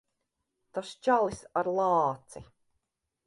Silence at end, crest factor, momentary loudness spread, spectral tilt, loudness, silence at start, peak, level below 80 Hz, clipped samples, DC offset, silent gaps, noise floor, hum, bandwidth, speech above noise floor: 0.85 s; 18 dB; 17 LU; -5.5 dB/octave; -29 LUFS; 0.75 s; -14 dBFS; -64 dBFS; under 0.1%; under 0.1%; none; -82 dBFS; none; 11.5 kHz; 54 dB